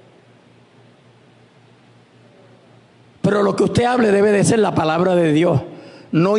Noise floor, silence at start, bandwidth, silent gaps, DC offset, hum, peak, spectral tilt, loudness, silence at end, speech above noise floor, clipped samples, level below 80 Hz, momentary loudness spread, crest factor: -50 dBFS; 3.25 s; 11 kHz; none; under 0.1%; none; -4 dBFS; -6 dB/octave; -16 LUFS; 0 s; 35 dB; under 0.1%; -54 dBFS; 8 LU; 14 dB